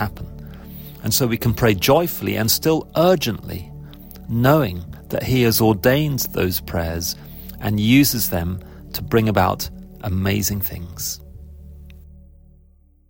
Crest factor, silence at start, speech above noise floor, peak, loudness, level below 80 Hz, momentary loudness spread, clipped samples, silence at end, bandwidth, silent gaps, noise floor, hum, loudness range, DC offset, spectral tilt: 18 dB; 0 s; 34 dB; -4 dBFS; -19 LUFS; -38 dBFS; 17 LU; under 0.1%; 0.95 s; 17 kHz; none; -53 dBFS; none; 4 LU; under 0.1%; -5 dB/octave